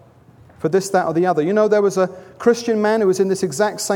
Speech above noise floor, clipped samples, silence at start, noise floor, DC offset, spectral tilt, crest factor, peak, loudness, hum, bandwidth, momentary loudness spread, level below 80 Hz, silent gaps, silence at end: 30 dB; under 0.1%; 0.6 s; -47 dBFS; under 0.1%; -5 dB/octave; 16 dB; -2 dBFS; -18 LUFS; none; 17 kHz; 5 LU; -62 dBFS; none; 0 s